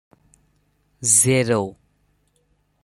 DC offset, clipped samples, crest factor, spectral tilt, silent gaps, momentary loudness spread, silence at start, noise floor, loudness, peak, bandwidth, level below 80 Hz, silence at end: under 0.1%; under 0.1%; 22 dB; -3.5 dB/octave; none; 11 LU; 1 s; -65 dBFS; -17 LUFS; 0 dBFS; 15 kHz; -60 dBFS; 1.1 s